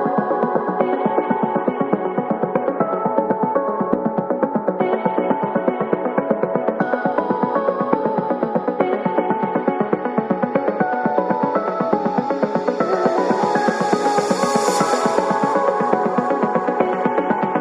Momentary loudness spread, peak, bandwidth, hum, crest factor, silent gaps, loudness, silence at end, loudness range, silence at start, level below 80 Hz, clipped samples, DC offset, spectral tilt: 3 LU; -2 dBFS; 13 kHz; none; 18 dB; none; -19 LUFS; 0 s; 2 LU; 0 s; -64 dBFS; under 0.1%; under 0.1%; -6 dB/octave